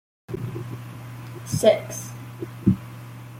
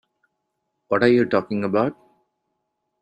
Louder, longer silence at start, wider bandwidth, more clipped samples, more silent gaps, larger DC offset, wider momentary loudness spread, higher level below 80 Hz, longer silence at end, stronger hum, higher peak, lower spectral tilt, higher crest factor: second, -25 LUFS vs -21 LUFS; second, 0.3 s vs 0.9 s; first, 16.5 kHz vs 8.6 kHz; neither; neither; neither; first, 18 LU vs 8 LU; first, -52 dBFS vs -64 dBFS; second, 0 s vs 1.1 s; neither; about the same, -2 dBFS vs -4 dBFS; second, -6 dB/octave vs -8 dB/octave; about the same, 24 dB vs 20 dB